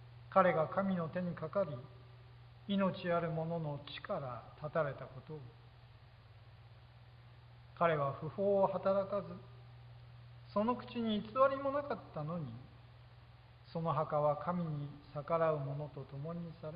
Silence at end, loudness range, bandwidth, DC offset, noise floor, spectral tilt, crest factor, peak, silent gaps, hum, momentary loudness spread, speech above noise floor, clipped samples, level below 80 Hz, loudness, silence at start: 0 s; 7 LU; 5 kHz; under 0.1%; -59 dBFS; -6 dB/octave; 24 dB; -14 dBFS; none; none; 24 LU; 22 dB; under 0.1%; -66 dBFS; -37 LUFS; 0 s